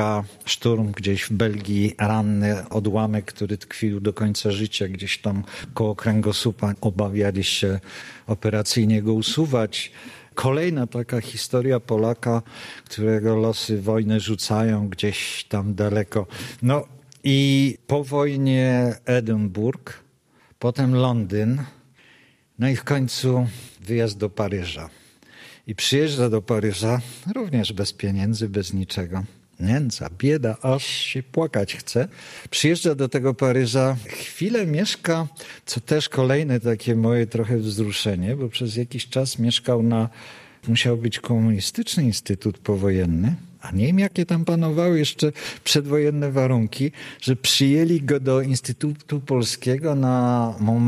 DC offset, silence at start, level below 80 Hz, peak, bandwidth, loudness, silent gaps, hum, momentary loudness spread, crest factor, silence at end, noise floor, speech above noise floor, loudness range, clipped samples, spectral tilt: under 0.1%; 0 s; -54 dBFS; -4 dBFS; 14.5 kHz; -22 LUFS; none; none; 9 LU; 18 dB; 0 s; -58 dBFS; 36 dB; 4 LU; under 0.1%; -5.5 dB/octave